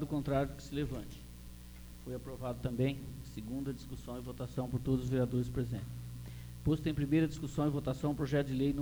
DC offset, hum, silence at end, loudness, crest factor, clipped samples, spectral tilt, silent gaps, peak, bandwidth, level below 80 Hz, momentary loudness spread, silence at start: under 0.1%; 60 Hz at -50 dBFS; 0 s; -37 LUFS; 16 dB; under 0.1%; -7.5 dB/octave; none; -20 dBFS; over 20 kHz; -50 dBFS; 15 LU; 0 s